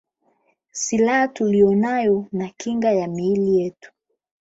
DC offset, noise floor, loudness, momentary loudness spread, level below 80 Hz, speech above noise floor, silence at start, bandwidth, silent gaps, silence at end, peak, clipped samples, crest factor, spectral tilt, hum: under 0.1%; -65 dBFS; -20 LUFS; 10 LU; -60 dBFS; 46 dB; 0.75 s; 8 kHz; none; 0.7 s; -4 dBFS; under 0.1%; 16 dB; -5.5 dB/octave; none